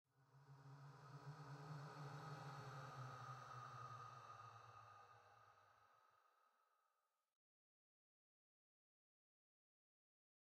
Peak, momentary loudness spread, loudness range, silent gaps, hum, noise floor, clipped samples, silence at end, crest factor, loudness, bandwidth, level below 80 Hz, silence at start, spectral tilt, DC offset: -44 dBFS; 10 LU; 9 LU; none; none; under -90 dBFS; under 0.1%; 3.85 s; 16 dB; -58 LUFS; 13 kHz; under -90 dBFS; 0.15 s; -5.5 dB/octave; under 0.1%